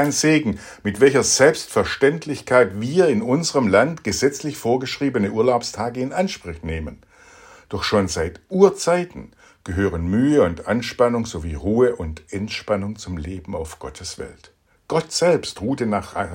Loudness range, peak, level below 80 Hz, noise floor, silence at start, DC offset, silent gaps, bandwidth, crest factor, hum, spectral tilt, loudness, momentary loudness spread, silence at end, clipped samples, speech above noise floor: 7 LU; -2 dBFS; -46 dBFS; -47 dBFS; 0 s; under 0.1%; none; 16.5 kHz; 20 dB; none; -4.5 dB/octave; -20 LUFS; 14 LU; 0 s; under 0.1%; 27 dB